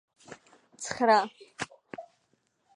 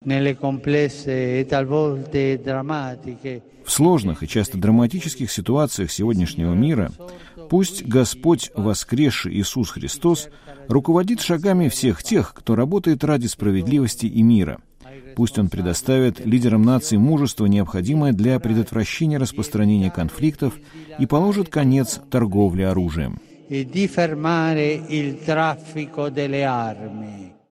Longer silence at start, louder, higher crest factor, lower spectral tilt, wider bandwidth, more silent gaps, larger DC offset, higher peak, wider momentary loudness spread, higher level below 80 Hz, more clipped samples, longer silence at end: first, 0.3 s vs 0.05 s; second, -28 LUFS vs -20 LUFS; first, 24 dB vs 16 dB; second, -3 dB/octave vs -6 dB/octave; second, 11 kHz vs 16 kHz; neither; neither; second, -8 dBFS vs -2 dBFS; first, 27 LU vs 10 LU; second, -74 dBFS vs -44 dBFS; neither; first, 0.75 s vs 0.2 s